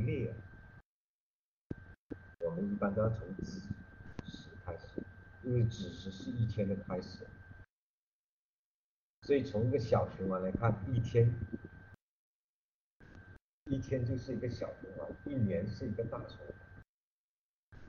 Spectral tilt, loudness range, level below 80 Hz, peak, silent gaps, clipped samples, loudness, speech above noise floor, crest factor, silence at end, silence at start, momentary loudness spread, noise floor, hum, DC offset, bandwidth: -8 dB/octave; 8 LU; -58 dBFS; -16 dBFS; 0.85-1.70 s, 1.98-2.09 s, 7.70-9.22 s, 12.02-13.00 s, 13.42-13.66 s, 16.89-17.72 s; under 0.1%; -37 LUFS; over 55 dB; 22 dB; 0 s; 0 s; 20 LU; under -90 dBFS; none; under 0.1%; 7 kHz